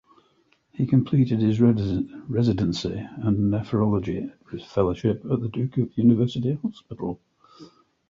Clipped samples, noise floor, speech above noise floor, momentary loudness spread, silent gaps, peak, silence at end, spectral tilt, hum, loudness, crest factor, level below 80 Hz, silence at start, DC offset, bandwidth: under 0.1%; -64 dBFS; 41 dB; 13 LU; none; -6 dBFS; 0.45 s; -8.5 dB/octave; none; -24 LUFS; 18 dB; -48 dBFS; 0.8 s; under 0.1%; 7.4 kHz